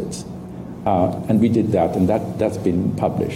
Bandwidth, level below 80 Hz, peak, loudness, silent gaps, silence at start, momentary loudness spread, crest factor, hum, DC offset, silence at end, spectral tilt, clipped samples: 15.5 kHz; -46 dBFS; -6 dBFS; -20 LUFS; none; 0 s; 14 LU; 14 dB; none; under 0.1%; 0 s; -8 dB/octave; under 0.1%